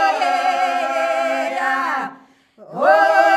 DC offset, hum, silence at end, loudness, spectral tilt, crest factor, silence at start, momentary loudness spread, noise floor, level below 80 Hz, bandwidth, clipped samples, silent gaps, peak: under 0.1%; none; 0 s; -18 LUFS; -2.5 dB/octave; 16 dB; 0 s; 10 LU; -47 dBFS; -80 dBFS; 13.5 kHz; under 0.1%; none; -2 dBFS